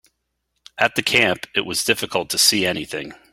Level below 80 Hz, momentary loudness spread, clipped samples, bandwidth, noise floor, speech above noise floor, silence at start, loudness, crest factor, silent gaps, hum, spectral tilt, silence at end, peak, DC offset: -56 dBFS; 13 LU; under 0.1%; 16.5 kHz; -74 dBFS; 53 dB; 0.75 s; -18 LUFS; 20 dB; none; none; -1.5 dB/octave; 0.15 s; 0 dBFS; under 0.1%